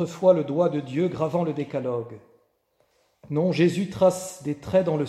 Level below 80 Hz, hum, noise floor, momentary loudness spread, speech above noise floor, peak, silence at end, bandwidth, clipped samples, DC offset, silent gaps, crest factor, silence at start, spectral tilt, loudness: -62 dBFS; none; -68 dBFS; 11 LU; 45 dB; -6 dBFS; 0 s; 13 kHz; under 0.1%; under 0.1%; none; 18 dB; 0 s; -7 dB/octave; -24 LUFS